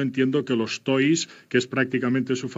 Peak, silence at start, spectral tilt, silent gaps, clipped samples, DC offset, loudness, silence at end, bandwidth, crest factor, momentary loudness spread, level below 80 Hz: -8 dBFS; 0 s; -5 dB/octave; none; under 0.1%; under 0.1%; -24 LUFS; 0 s; 8 kHz; 16 dB; 4 LU; -76 dBFS